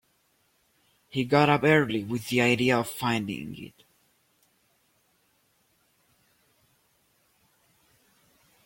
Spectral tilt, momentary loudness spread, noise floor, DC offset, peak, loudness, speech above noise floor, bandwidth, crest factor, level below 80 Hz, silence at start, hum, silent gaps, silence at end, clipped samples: -5.5 dB/octave; 17 LU; -69 dBFS; under 0.1%; -8 dBFS; -25 LUFS; 44 dB; 16.5 kHz; 22 dB; -64 dBFS; 1.15 s; none; none; 5 s; under 0.1%